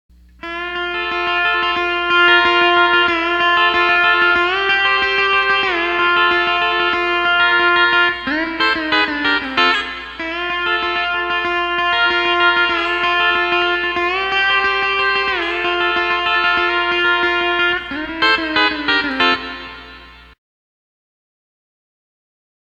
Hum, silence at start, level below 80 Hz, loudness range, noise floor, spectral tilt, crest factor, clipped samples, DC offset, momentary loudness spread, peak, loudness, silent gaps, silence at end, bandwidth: none; 0.45 s; -46 dBFS; 4 LU; -39 dBFS; -3.5 dB/octave; 16 dB; under 0.1%; under 0.1%; 8 LU; 0 dBFS; -15 LUFS; none; 2.5 s; 8.4 kHz